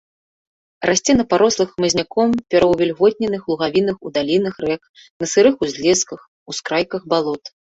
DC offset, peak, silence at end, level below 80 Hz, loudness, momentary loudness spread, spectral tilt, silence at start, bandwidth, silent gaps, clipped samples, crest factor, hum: under 0.1%; -2 dBFS; 0.3 s; -50 dBFS; -18 LUFS; 11 LU; -3.5 dB/octave; 0.8 s; 8.2 kHz; 4.89-4.94 s, 5.10-5.20 s, 6.28-6.46 s; under 0.1%; 16 dB; none